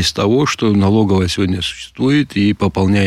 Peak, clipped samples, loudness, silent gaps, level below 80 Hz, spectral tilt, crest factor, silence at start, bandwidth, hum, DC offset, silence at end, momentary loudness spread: -4 dBFS; under 0.1%; -15 LUFS; none; -40 dBFS; -5.5 dB/octave; 10 dB; 0 s; 13.5 kHz; none; under 0.1%; 0 s; 6 LU